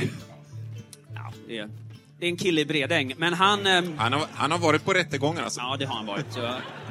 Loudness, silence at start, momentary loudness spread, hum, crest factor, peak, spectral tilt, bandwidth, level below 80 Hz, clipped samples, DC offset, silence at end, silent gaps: -25 LUFS; 0 s; 19 LU; none; 22 dB; -6 dBFS; -4 dB/octave; 15.5 kHz; -66 dBFS; under 0.1%; under 0.1%; 0 s; none